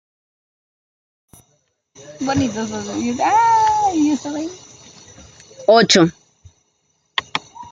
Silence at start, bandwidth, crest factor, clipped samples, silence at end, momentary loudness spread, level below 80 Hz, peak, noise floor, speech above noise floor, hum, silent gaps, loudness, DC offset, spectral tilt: 2 s; 11.5 kHz; 20 dB; under 0.1%; 0.05 s; 14 LU; -58 dBFS; 0 dBFS; -65 dBFS; 49 dB; none; none; -17 LUFS; under 0.1%; -4 dB/octave